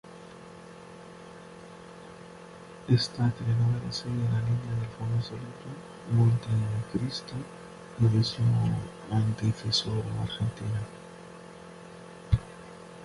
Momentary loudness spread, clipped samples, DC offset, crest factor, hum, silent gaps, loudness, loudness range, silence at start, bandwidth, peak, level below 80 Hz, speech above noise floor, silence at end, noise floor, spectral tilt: 21 LU; under 0.1%; under 0.1%; 20 dB; none; none; -29 LUFS; 4 LU; 0.05 s; 11.5 kHz; -10 dBFS; -50 dBFS; 19 dB; 0 s; -47 dBFS; -6.5 dB/octave